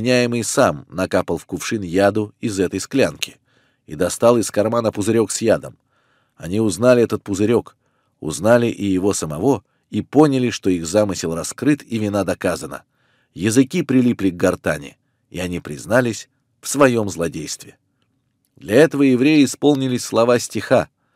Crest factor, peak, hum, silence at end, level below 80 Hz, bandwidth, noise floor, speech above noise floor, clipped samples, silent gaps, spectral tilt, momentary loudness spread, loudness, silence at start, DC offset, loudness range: 18 dB; 0 dBFS; none; 0.3 s; -52 dBFS; 16 kHz; -67 dBFS; 49 dB; under 0.1%; none; -5 dB/octave; 13 LU; -18 LUFS; 0 s; under 0.1%; 4 LU